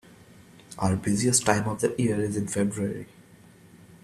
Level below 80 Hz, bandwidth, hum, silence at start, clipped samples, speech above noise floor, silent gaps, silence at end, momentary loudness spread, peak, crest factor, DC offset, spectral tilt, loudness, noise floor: -58 dBFS; 14.5 kHz; none; 0.7 s; under 0.1%; 27 dB; none; 0.1 s; 13 LU; -4 dBFS; 24 dB; under 0.1%; -4.5 dB/octave; -26 LUFS; -53 dBFS